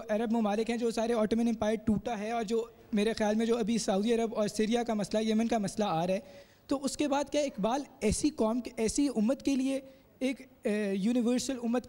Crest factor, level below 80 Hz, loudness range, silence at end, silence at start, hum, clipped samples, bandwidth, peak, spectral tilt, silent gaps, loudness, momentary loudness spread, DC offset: 12 dB; -54 dBFS; 2 LU; 0 s; 0 s; none; under 0.1%; 16 kHz; -18 dBFS; -5 dB/octave; none; -31 LUFS; 5 LU; under 0.1%